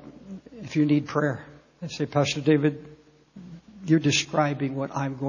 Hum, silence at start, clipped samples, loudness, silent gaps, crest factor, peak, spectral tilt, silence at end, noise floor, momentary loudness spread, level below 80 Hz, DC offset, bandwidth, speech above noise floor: none; 0 s; under 0.1%; -25 LUFS; none; 18 dB; -8 dBFS; -5.5 dB/octave; 0 s; -49 dBFS; 21 LU; -62 dBFS; under 0.1%; 7.4 kHz; 25 dB